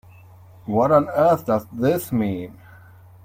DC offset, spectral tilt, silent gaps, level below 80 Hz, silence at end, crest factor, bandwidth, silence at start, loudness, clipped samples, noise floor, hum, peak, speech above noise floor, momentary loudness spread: under 0.1%; -7.5 dB/octave; none; -56 dBFS; 0.75 s; 18 dB; 16.5 kHz; 0.65 s; -20 LUFS; under 0.1%; -46 dBFS; none; -4 dBFS; 27 dB; 14 LU